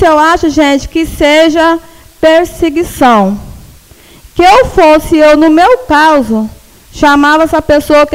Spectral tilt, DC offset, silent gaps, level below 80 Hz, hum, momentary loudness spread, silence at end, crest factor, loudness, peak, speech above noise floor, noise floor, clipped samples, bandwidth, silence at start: -4.5 dB/octave; under 0.1%; none; -30 dBFS; none; 9 LU; 0 s; 8 dB; -7 LUFS; 0 dBFS; 31 dB; -37 dBFS; 0.6%; 16.5 kHz; 0 s